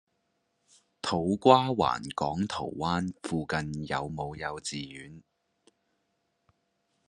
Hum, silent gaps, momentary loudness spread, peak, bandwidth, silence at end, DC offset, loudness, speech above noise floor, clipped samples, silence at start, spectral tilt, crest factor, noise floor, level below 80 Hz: none; none; 15 LU; -4 dBFS; 11.5 kHz; 1.9 s; under 0.1%; -29 LUFS; 48 dB; under 0.1%; 1.05 s; -5.5 dB/octave; 28 dB; -77 dBFS; -60 dBFS